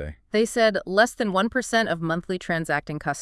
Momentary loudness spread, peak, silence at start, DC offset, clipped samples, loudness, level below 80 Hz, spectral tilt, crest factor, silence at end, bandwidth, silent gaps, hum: 6 LU; -6 dBFS; 0 s; under 0.1%; under 0.1%; -23 LUFS; -50 dBFS; -4.5 dB/octave; 18 dB; 0 s; 12 kHz; none; none